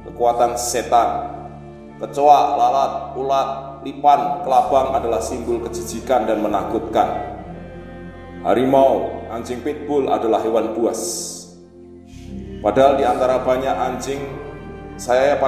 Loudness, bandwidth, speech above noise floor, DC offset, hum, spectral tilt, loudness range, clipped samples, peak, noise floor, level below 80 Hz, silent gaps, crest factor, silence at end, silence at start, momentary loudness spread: -19 LUFS; 16 kHz; 23 dB; under 0.1%; none; -4.5 dB/octave; 4 LU; under 0.1%; 0 dBFS; -41 dBFS; -42 dBFS; none; 20 dB; 0 s; 0 s; 20 LU